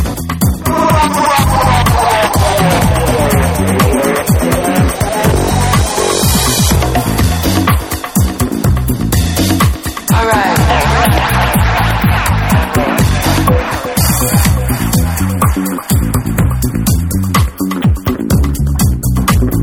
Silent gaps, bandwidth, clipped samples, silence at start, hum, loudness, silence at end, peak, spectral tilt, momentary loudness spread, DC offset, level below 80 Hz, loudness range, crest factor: none; 19.5 kHz; under 0.1%; 0 s; none; -12 LUFS; 0 s; 0 dBFS; -5 dB/octave; 4 LU; under 0.1%; -18 dBFS; 3 LU; 12 dB